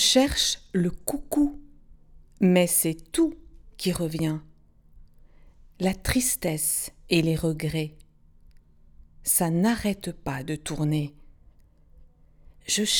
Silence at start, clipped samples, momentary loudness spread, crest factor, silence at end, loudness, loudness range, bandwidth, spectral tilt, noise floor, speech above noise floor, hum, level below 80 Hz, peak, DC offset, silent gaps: 0 s; under 0.1%; 11 LU; 24 dB; 0 s; -25 LUFS; 4 LU; over 20 kHz; -4 dB/octave; -55 dBFS; 30 dB; none; -46 dBFS; -2 dBFS; under 0.1%; none